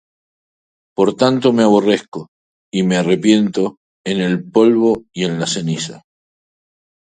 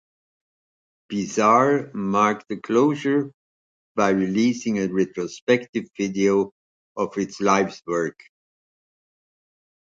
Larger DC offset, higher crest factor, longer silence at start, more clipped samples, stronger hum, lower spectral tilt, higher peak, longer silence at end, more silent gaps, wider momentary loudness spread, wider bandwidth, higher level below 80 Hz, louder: neither; about the same, 16 dB vs 20 dB; about the same, 1 s vs 1.1 s; neither; neither; about the same, -5.5 dB/octave vs -5.5 dB/octave; first, 0 dBFS vs -4 dBFS; second, 1.05 s vs 1.7 s; second, 2.08-2.12 s, 2.28-2.72 s, 3.77-4.04 s vs 3.34-3.95 s, 5.42-5.47 s, 5.69-5.73 s, 6.52-6.95 s; about the same, 12 LU vs 11 LU; first, 9.4 kHz vs 7.8 kHz; first, -58 dBFS vs -64 dBFS; first, -16 LUFS vs -22 LUFS